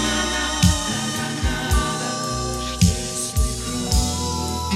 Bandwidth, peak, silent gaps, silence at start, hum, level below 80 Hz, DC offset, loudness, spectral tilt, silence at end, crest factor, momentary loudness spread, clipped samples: 16 kHz; -2 dBFS; none; 0 s; none; -28 dBFS; under 0.1%; -22 LUFS; -3.5 dB/octave; 0 s; 18 dB; 6 LU; under 0.1%